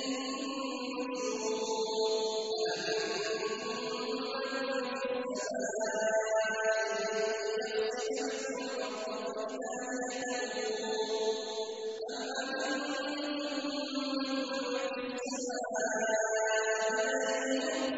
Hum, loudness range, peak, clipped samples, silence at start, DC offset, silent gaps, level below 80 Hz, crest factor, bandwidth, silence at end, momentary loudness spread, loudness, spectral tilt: none; 3 LU; -18 dBFS; under 0.1%; 0 s; under 0.1%; none; -78 dBFS; 16 dB; 8 kHz; 0 s; 6 LU; -34 LUFS; -1.5 dB/octave